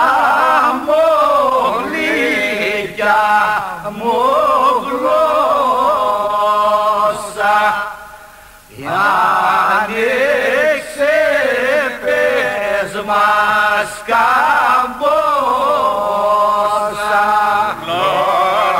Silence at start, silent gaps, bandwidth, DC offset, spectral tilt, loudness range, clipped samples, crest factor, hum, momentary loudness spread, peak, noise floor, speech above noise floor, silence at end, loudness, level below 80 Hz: 0 s; none; 16 kHz; under 0.1%; -3.5 dB/octave; 2 LU; under 0.1%; 12 dB; none; 5 LU; -2 dBFS; -39 dBFS; 26 dB; 0 s; -14 LUFS; -48 dBFS